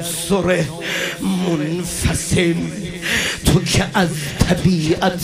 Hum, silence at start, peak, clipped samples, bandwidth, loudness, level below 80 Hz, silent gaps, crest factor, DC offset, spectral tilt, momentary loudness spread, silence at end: none; 0 s; 0 dBFS; under 0.1%; 15.5 kHz; -18 LUFS; -34 dBFS; none; 18 dB; under 0.1%; -4.5 dB/octave; 5 LU; 0 s